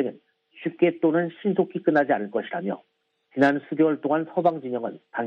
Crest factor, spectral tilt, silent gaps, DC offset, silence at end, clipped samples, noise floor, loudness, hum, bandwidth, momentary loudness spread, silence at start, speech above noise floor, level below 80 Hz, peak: 18 dB; -8.5 dB/octave; none; under 0.1%; 0 s; under 0.1%; -51 dBFS; -24 LUFS; none; 7 kHz; 11 LU; 0 s; 28 dB; -74 dBFS; -6 dBFS